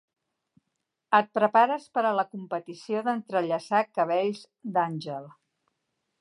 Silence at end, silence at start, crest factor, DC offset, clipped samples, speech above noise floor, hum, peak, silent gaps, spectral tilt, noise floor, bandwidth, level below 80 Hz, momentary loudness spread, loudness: 0.9 s; 1.1 s; 20 dB; under 0.1%; under 0.1%; 56 dB; none; -8 dBFS; none; -6 dB/octave; -82 dBFS; 11 kHz; -84 dBFS; 13 LU; -27 LUFS